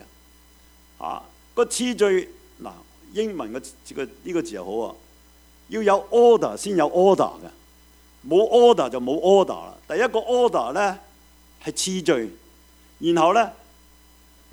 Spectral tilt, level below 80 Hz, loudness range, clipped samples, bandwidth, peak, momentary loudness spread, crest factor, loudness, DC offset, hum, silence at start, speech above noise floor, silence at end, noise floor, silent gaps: -4.5 dB/octave; -56 dBFS; 8 LU; under 0.1%; over 20 kHz; -2 dBFS; 19 LU; 20 dB; -21 LUFS; under 0.1%; none; 1 s; 32 dB; 1 s; -53 dBFS; none